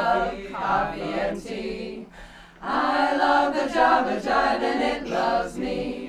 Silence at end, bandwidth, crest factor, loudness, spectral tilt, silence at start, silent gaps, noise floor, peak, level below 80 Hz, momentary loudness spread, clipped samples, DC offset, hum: 0 s; 13.5 kHz; 18 dB; -24 LUFS; -5 dB/octave; 0 s; none; -45 dBFS; -6 dBFS; -48 dBFS; 12 LU; under 0.1%; under 0.1%; none